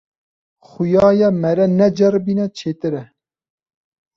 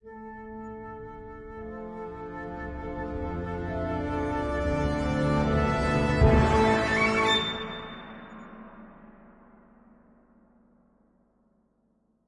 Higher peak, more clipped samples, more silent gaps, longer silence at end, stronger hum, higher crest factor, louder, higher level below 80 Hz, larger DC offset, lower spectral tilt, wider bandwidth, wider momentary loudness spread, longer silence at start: first, -2 dBFS vs -8 dBFS; neither; neither; second, 1.1 s vs 2.95 s; neither; second, 16 dB vs 22 dB; first, -16 LUFS vs -27 LUFS; second, -52 dBFS vs -38 dBFS; neither; first, -8 dB/octave vs -6 dB/octave; second, 7.4 kHz vs 11.5 kHz; second, 11 LU vs 21 LU; first, 0.8 s vs 0.05 s